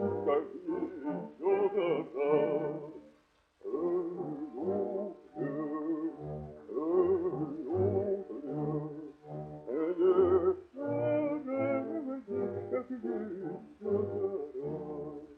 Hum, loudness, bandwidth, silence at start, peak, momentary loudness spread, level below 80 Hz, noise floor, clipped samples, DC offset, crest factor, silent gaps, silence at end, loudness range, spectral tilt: none; -34 LUFS; 3.4 kHz; 0 s; -16 dBFS; 13 LU; -70 dBFS; -68 dBFS; under 0.1%; under 0.1%; 18 dB; none; 0 s; 5 LU; -10 dB/octave